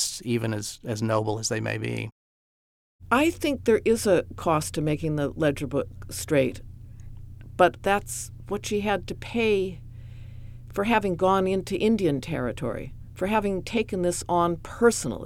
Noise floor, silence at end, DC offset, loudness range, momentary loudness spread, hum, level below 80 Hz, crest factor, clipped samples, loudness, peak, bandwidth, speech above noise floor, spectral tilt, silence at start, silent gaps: under -90 dBFS; 0 s; under 0.1%; 3 LU; 19 LU; none; -46 dBFS; 22 dB; under 0.1%; -26 LUFS; -4 dBFS; 17 kHz; over 65 dB; -5 dB/octave; 0 s; 2.12-2.99 s